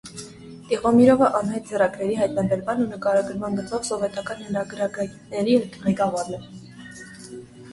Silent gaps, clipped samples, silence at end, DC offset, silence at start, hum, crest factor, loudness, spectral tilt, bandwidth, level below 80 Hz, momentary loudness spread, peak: none; under 0.1%; 0 s; under 0.1%; 0.05 s; none; 20 dB; -23 LUFS; -6 dB/octave; 11.5 kHz; -56 dBFS; 22 LU; -4 dBFS